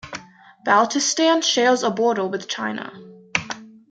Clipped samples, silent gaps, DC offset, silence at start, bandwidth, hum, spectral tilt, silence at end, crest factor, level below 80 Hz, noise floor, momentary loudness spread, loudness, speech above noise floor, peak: under 0.1%; none; under 0.1%; 0.05 s; 9.4 kHz; none; -2.5 dB/octave; 0.2 s; 22 dB; -64 dBFS; -46 dBFS; 17 LU; -20 LUFS; 26 dB; 0 dBFS